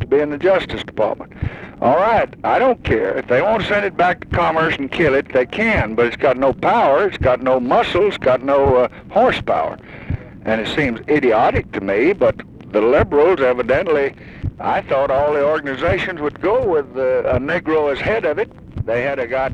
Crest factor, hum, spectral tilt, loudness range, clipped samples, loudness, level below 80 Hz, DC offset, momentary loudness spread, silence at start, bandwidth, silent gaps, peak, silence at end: 14 dB; none; -7 dB/octave; 3 LU; under 0.1%; -17 LUFS; -38 dBFS; under 0.1%; 8 LU; 0 s; 9.2 kHz; none; -2 dBFS; 0 s